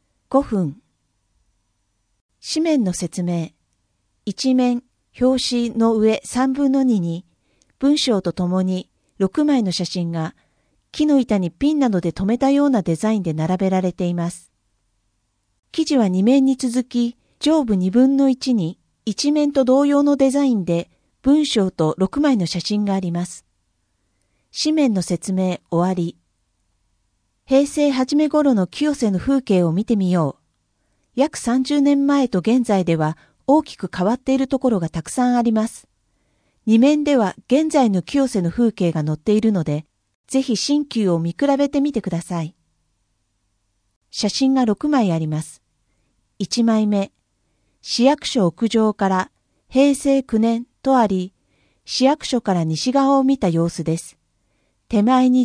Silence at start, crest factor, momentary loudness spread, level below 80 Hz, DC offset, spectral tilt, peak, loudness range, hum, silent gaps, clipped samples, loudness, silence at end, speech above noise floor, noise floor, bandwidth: 0.3 s; 18 dB; 9 LU; -52 dBFS; under 0.1%; -6 dB/octave; -2 dBFS; 5 LU; none; 2.21-2.29 s, 15.59-15.63 s, 40.15-40.24 s, 43.96-44.01 s; under 0.1%; -19 LUFS; 0 s; 51 dB; -69 dBFS; 10.5 kHz